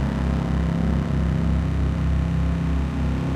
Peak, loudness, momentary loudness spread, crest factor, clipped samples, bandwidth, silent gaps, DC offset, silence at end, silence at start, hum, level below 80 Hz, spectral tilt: -10 dBFS; -23 LUFS; 2 LU; 12 dB; under 0.1%; 8.8 kHz; none; under 0.1%; 0 s; 0 s; none; -26 dBFS; -8.5 dB/octave